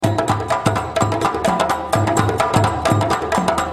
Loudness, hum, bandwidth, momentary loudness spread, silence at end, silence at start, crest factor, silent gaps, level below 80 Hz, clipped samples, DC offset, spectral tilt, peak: -18 LUFS; none; 14.5 kHz; 3 LU; 0 s; 0 s; 16 dB; none; -42 dBFS; under 0.1%; under 0.1%; -5.5 dB/octave; -2 dBFS